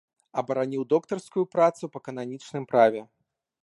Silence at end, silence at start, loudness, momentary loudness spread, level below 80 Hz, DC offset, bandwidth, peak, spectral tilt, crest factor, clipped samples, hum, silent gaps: 0.6 s; 0.35 s; -26 LUFS; 14 LU; -76 dBFS; under 0.1%; 11.5 kHz; -6 dBFS; -6.5 dB/octave; 20 dB; under 0.1%; none; none